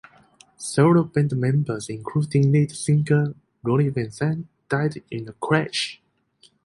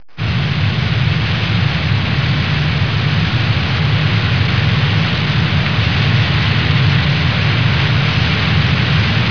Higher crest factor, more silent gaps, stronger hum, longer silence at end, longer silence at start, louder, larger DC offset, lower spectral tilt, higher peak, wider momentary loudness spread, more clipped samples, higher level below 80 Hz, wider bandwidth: first, 18 dB vs 12 dB; neither; neither; first, 0.7 s vs 0 s; first, 0.6 s vs 0.15 s; second, -22 LUFS vs -14 LUFS; second, under 0.1% vs 2%; about the same, -6.5 dB/octave vs -6.5 dB/octave; about the same, -4 dBFS vs -2 dBFS; first, 12 LU vs 2 LU; neither; second, -60 dBFS vs -30 dBFS; first, 11.5 kHz vs 5.4 kHz